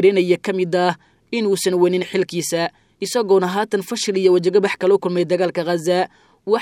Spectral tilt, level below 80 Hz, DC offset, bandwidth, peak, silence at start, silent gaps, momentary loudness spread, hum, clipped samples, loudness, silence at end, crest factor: -5 dB/octave; -68 dBFS; under 0.1%; 16 kHz; 0 dBFS; 0 s; none; 7 LU; none; under 0.1%; -19 LUFS; 0 s; 18 dB